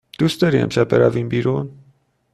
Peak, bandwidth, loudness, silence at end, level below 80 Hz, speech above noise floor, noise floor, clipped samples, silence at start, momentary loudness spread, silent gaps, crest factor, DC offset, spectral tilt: -2 dBFS; 13.5 kHz; -18 LUFS; 0.6 s; -52 dBFS; 40 dB; -57 dBFS; under 0.1%; 0.2 s; 8 LU; none; 16 dB; under 0.1%; -7 dB/octave